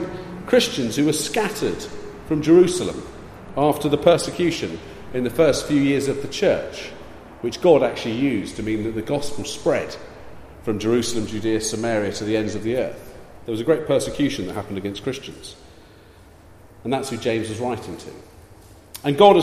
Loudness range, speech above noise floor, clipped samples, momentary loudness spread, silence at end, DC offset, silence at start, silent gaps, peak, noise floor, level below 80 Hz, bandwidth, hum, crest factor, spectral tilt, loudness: 8 LU; 27 dB; under 0.1%; 19 LU; 0 s; under 0.1%; 0 s; none; 0 dBFS; -47 dBFS; -48 dBFS; 15.5 kHz; none; 20 dB; -5 dB/octave; -21 LUFS